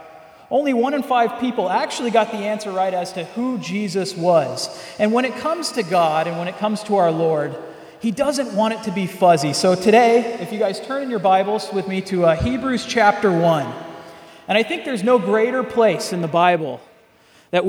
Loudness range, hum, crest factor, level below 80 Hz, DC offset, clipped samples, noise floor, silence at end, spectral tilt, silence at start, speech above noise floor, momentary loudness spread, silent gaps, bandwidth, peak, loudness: 3 LU; none; 18 dB; -50 dBFS; under 0.1%; under 0.1%; -52 dBFS; 0 s; -5 dB/octave; 0 s; 34 dB; 9 LU; none; 17.5 kHz; 0 dBFS; -19 LUFS